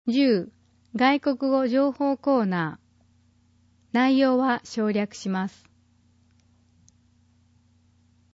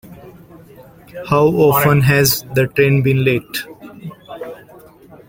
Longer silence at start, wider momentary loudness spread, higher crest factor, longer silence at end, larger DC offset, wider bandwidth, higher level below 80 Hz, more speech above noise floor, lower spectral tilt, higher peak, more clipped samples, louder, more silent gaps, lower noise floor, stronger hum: about the same, 0.05 s vs 0.1 s; second, 9 LU vs 22 LU; about the same, 18 dB vs 16 dB; first, 2.9 s vs 0.75 s; neither; second, 7.8 kHz vs 17 kHz; second, -70 dBFS vs -46 dBFS; first, 39 dB vs 28 dB; about the same, -6 dB/octave vs -5.5 dB/octave; second, -8 dBFS vs 0 dBFS; neither; second, -24 LUFS vs -14 LUFS; neither; first, -62 dBFS vs -42 dBFS; neither